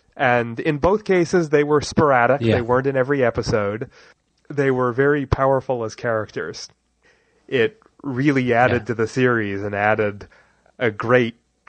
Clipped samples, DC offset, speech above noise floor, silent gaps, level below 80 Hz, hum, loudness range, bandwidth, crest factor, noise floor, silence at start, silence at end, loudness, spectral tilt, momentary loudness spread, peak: under 0.1%; under 0.1%; 41 dB; none; -44 dBFS; none; 4 LU; 9 kHz; 18 dB; -60 dBFS; 0.15 s; 0.35 s; -20 LUFS; -6.5 dB/octave; 11 LU; -2 dBFS